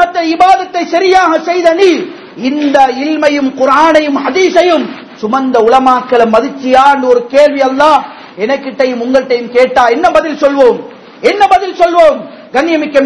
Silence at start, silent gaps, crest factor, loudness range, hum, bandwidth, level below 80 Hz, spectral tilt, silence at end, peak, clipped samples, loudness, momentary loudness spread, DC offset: 0 s; none; 8 dB; 1 LU; none; 11 kHz; -46 dBFS; -4 dB/octave; 0 s; 0 dBFS; 4%; -9 LUFS; 8 LU; under 0.1%